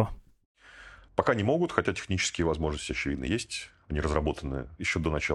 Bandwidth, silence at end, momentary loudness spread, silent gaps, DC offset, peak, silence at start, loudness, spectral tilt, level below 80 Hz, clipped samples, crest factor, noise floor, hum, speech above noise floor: 12 kHz; 0 s; 10 LU; 0.45-0.55 s; under 0.1%; -4 dBFS; 0 s; -30 LUFS; -5 dB/octave; -42 dBFS; under 0.1%; 26 dB; -51 dBFS; none; 22 dB